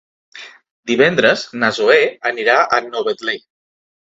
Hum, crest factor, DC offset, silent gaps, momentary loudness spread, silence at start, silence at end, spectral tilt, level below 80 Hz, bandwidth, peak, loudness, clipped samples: none; 18 dB; under 0.1%; 0.71-0.83 s; 19 LU; 0.35 s; 0.7 s; -4 dB/octave; -60 dBFS; 7.8 kHz; 0 dBFS; -15 LUFS; under 0.1%